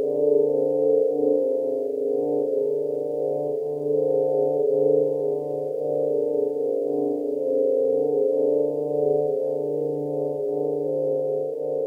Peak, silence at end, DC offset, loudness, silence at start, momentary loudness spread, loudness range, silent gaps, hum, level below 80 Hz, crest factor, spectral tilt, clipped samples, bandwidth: -10 dBFS; 0 s; under 0.1%; -23 LUFS; 0 s; 6 LU; 1 LU; none; none; -78 dBFS; 14 dB; -10.5 dB/octave; under 0.1%; 1.1 kHz